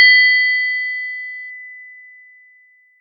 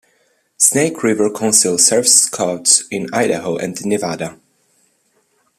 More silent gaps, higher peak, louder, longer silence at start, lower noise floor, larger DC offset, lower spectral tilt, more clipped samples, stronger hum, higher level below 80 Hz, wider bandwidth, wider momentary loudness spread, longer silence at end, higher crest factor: neither; about the same, 0 dBFS vs 0 dBFS; about the same, -13 LUFS vs -13 LUFS; second, 0 s vs 0.6 s; second, -52 dBFS vs -61 dBFS; neither; second, 10 dB/octave vs -2 dB/octave; neither; neither; second, under -90 dBFS vs -62 dBFS; second, 4.9 kHz vs over 20 kHz; first, 25 LU vs 12 LU; second, 1.1 s vs 1.25 s; about the same, 18 dB vs 18 dB